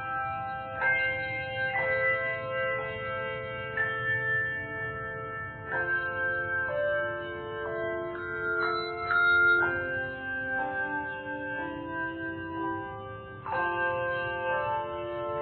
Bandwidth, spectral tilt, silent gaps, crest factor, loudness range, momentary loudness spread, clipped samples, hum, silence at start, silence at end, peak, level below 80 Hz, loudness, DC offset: 4.5 kHz; -2.5 dB/octave; none; 16 dB; 6 LU; 10 LU; under 0.1%; none; 0 s; 0 s; -16 dBFS; -58 dBFS; -30 LUFS; under 0.1%